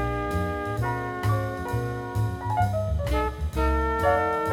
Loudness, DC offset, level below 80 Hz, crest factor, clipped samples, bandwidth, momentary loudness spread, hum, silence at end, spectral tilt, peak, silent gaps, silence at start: -27 LUFS; under 0.1%; -32 dBFS; 16 dB; under 0.1%; 16.5 kHz; 6 LU; none; 0 s; -7 dB/octave; -10 dBFS; none; 0 s